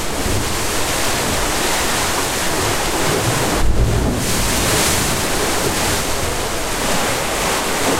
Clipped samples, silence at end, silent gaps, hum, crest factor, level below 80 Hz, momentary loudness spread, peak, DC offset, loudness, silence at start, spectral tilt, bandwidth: under 0.1%; 0 s; none; none; 14 dB; -26 dBFS; 4 LU; -4 dBFS; under 0.1%; -17 LUFS; 0 s; -3 dB/octave; 16 kHz